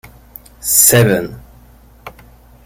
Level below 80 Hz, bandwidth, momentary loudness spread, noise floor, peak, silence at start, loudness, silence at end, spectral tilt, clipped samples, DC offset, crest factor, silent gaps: -42 dBFS; over 20 kHz; 17 LU; -43 dBFS; 0 dBFS; 0.65 s; -11 LUFS; 0.55 s; -3.5 dB/octave; under 0.1%; under 0.1%; 16 dB; none